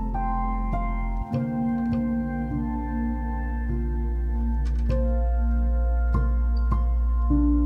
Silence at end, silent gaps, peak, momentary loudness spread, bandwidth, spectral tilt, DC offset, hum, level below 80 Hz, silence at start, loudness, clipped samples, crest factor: 0 s; none; -10 dBFS; 4 LU; 2.8 kHz; -10.5 dB/octave; under 0.1%; none; -24 dBFS; 0 s; -26 LUFS; under 0.1%; 12 dB